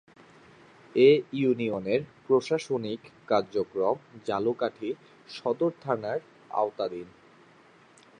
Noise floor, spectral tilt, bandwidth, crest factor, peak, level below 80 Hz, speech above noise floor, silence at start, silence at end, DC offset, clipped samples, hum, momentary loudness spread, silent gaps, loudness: -57 dBFS; -6.5 dB/octave; 9.8 kHz; 20 dB; -8 dBFS; -70 dBFS; 30 dB; 0.95 s; 1.15 s; under 0.1%; under 0.1%; none; 14 LU; none; -28 LUFS